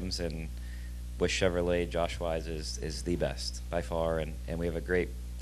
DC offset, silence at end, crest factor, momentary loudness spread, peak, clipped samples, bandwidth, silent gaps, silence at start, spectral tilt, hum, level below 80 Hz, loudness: under 0.1%; 0 s; 20 dB; 11 LU; -12 dBFS; under 0.1%; 13 kHz; none; 0 s; -5 dB/octave; 60 Hz at -40 dBFS; -40 dBFS; -33 LUFS